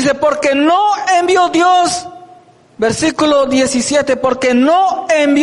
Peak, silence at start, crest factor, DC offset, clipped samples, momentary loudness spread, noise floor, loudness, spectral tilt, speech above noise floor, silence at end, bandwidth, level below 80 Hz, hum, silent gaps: -2 dBFS; 0 s; 10 dB; under 0.1%; under 0.1%; 5 LU; -43 dBFS; -12 LUFS; -3.5 dB/octave; 31 dB; 0 s; 11.5 kHz; -48 dBFS; none; none